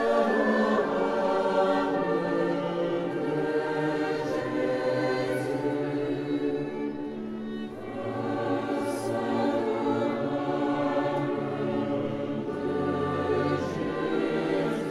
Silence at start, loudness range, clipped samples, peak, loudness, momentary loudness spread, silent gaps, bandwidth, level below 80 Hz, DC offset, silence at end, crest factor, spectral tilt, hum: 0 s; 4 LU; under 0.1%; -12 dBFS; -28 LUFS; 7 LU; none; 12.5 kHz; -62 dBFS; under 0.1%; 0 s; 14 dB; -7 dB/octave; none